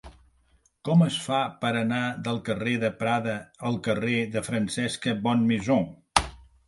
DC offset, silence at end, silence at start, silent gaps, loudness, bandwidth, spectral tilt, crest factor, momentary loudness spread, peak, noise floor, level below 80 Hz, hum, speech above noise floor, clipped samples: under 0.1%; 0.25 s; 0.05 s; none; -26 LUFS; 11.5 kHz; -5.5 dB/octave; 26 dB; 7 LU; -2 dBFS; -64 dBFS; -50 dBFS; none; 39 dB; under 0.1%